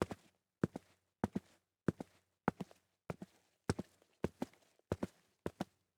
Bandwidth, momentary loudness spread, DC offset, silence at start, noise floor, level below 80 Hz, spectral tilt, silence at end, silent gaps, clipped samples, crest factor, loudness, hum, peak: 17.5 kHz; 12 LU; under 0.1%; 0 s; -67 dBFS; -64 dBFS; -7 dB/octave; 0.35 s; none; under 0.1%; 28 dB; -45 LUFS; none; -18 dBFS